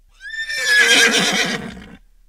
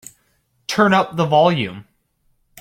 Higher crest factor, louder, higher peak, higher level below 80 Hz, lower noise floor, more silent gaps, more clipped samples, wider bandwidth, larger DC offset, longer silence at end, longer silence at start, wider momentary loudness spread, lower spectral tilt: about the same, 16 dB vs 16 dB; first, -14 LUFS vs -17 LUFS; about the same, -2 dBFS vs -2 dBFS; first, -50 dBFS vs -58 dBFS; second, -42 dBFS vs -64 dBFS; neither; neither; about the same, 16 kHz vs 16 kHz; neither; second, 0.35 s vs 0.8 s; second, 0.2 s vs 0.7 s; first, 18 LU vs 12 LU; second, -1 dB/octave vs -5.5 dB/octave